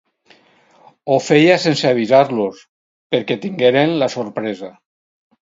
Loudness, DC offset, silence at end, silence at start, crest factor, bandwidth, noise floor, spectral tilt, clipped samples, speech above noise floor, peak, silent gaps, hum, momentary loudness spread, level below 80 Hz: -16 LUFS; under 0.1%; 0.7 s; 1.05 s; 18 dB; 7.8 kHz; -53 dBFS; -5.5 dB/octave; under 0.1%; 37 dB; 0 dBFS; 2.69-3.10 s; none; 13 LU; -66 dBFS